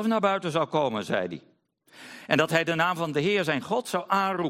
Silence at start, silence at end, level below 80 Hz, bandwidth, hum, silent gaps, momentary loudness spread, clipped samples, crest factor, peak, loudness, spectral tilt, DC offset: 0 s; 0 s; -70 dBFS; 16.5 kHz; none; none; 9 LU; under 0.1%; 20 dB; -6 dBFS; -26 LUFS; -5 dB/octave; under 0.1%